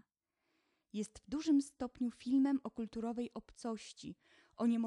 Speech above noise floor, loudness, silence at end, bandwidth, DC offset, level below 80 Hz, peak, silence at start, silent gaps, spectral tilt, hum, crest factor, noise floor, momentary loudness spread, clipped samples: 48 dB; -38 LUFS; 0 s; 11 kHz; under 0.1%; -70 dBFS; -24 dBFS; 0.95 s; none; -5.5 dB/octave; none; 14 dB; -86 dBFS; 13 LU; under 0.1%